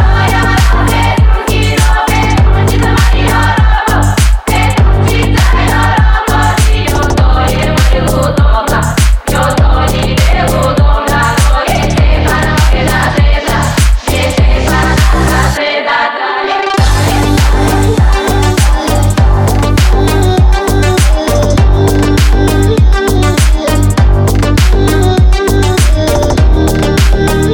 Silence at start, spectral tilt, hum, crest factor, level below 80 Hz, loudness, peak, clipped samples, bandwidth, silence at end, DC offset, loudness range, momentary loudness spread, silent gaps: 0 s; -5.5 dB/octave; none; 6 dB; -10 dBFS; -9 LUFS; 0 dBFS; under 0.1%; 18.5 kHz; 0 s; under 0.1%; 1 LU; 2 LU; none